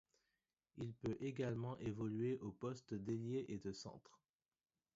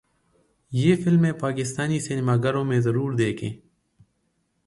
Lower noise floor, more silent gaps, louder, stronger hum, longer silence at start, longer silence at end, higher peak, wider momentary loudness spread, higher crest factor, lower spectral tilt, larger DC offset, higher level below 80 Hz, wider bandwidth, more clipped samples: first, under -90 dBFS vs -71 dBFS; neither; second, -46 LUFS vs -23 LUFS; neither; about the same, 0.75 s vs 0.7 s; second, 0.95 s vs 1.1 s; second, -30 dBFS vs -6 dBFS; about the same, 10 LU vs 10 LU; about the same, 16 dB vs 18 dB; about the same, -7.5 dB/octave vs -6.5 dB/octave; neither; second, -72 dBFS vs -58 dBFS; second, 7.6 kHz vs 11.5 kHz; neither